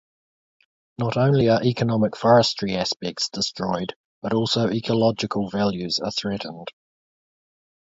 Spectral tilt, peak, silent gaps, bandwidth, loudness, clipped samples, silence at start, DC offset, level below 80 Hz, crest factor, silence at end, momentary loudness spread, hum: -5.5 dB/octave; -4 dBFS; 3.96-4.22 s; 8 kHz; -22 LUFS; under 0.1%; 1 s; under 0.1%; -56 dBFS; 20 dB; 1.15 s; 12 LU; none